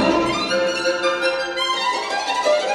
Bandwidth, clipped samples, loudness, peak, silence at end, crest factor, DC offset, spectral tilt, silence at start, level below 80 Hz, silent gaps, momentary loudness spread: 12.5 kHz; under 0.1%; -20 LUFS; -4 dBFS; 0 s; 16 dB; under 0.1%; -3 dB/octave; 0 s; -50 dBFS; none; 3 LU